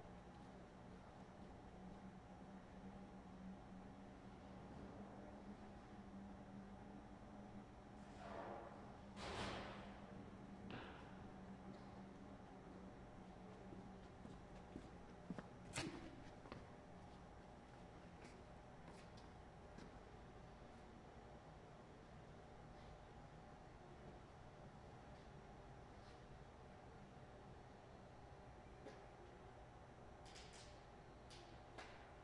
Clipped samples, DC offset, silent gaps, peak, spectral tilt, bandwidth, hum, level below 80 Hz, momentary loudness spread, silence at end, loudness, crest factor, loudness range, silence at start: under 0.1%; under 0.1%; none; -34 dBFS; -5.5 dB/octave; 10.5 kHz; none; -68 dBFS; 7 LU; 0 s; -59 LUFS; 24 dB; 7 LU; 0 s